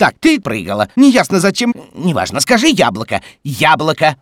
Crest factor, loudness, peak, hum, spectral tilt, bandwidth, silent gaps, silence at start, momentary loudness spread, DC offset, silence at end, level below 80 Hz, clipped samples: 12 dB; -13 LUFS; 0 dBFS; none; -4.5 dB/octave; 16.5 kHz; none; 0 s; 10 LU; under 0.1%; 0.05 s; -48 dBFS; under 0.1%